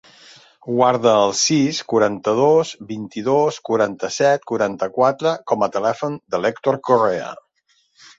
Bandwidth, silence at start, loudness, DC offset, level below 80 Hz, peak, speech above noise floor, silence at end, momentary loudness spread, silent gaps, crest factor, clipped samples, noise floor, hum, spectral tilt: 8 kHz; 0.65 s; -18 LUFS; under 0.1%; -62 dBFS; -2 dBFS; 45 dB; 0.85 s; 10 LU; none; 18 dB; under 0.1%; -63 dBFS; none; -4.5 dB/octave